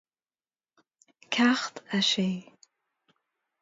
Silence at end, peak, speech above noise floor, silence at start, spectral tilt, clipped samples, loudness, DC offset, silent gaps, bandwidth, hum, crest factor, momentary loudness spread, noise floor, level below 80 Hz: 1.2 s; -10 dBFS; over 64 dB; 1.3 s; -3.5 dB/octave; under 0.1%; -26 LUFS; under 0.1%; none; 7.8 kHz; none; 22 dB; 8 LU; under -90 dBFS; -76 dBFS